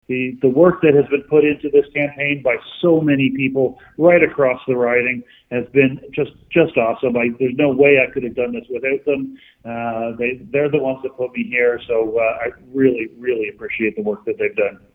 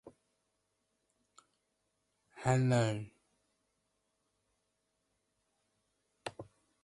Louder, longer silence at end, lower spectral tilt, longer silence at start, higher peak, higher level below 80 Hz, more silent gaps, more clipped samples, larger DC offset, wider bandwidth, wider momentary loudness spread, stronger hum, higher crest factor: first, -18 LUFS vs -33 LUFS; second, 0.2 s vs 0.4 s; first, -9.5 dB/octave vs -6.5 dB/octave; about the same, 0.1 s vs 0.05 s; first, 0 dBFS vs -16 dBFS; first, -54 dBFS vs -70 dBFS; neither; neither; neither; second, 3.9 kHz vs 11.5 kHz; second, 11 LU vs 21 LU; neither; second, 18 dB vs 24 dB